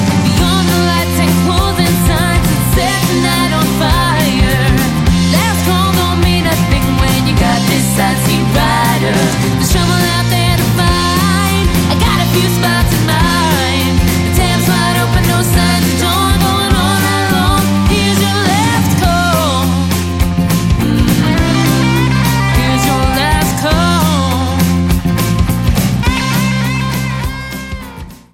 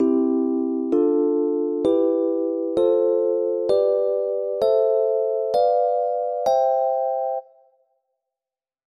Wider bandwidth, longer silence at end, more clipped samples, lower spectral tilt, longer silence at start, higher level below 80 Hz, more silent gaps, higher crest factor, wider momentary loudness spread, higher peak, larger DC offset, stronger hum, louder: first, 17 kHz vs 10 kHz; second, 0.2 s vs 1.45 s; neither; second, -5 dB/octave vs -7 dB/octave; about the same, 0 s vs 0 s; first, -22 dBFS vs -64 dBFS; neither; about the same, 12 dB vs 12 dB; second, 2 LU vs 5 LU; first, 0 dBFS vs -8 dBFS; neither; neither; first, -12 LUFS vs -21 LUFS